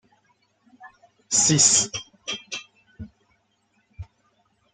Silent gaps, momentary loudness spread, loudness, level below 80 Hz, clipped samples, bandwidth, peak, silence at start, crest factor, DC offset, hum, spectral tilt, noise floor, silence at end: none; 29 LU; -19 LUFS; -58 dBFS; under 0.1%; 11 kHz; -4 dBFS; 0.8 s; 24 dB; under 0.1%; none; -1.5 dB/octave; -68 dBFS; 0.7 s